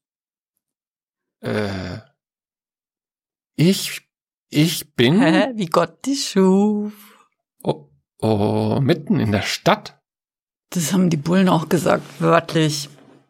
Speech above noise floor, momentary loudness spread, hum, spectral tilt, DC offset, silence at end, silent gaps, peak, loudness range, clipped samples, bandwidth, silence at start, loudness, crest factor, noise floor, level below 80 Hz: over 72 dB; 13 LU; none; -5.5 dB/octave; under 0.1%; 0.4 s; 4.34-4.47 s, 10.39-10.47 s; -2 dBFS; 7 LU; under 0.1%; 16.5 kHz; 1.45 s; -19 LUFS; 18 dB; under -90 dBFS; -58 dBFS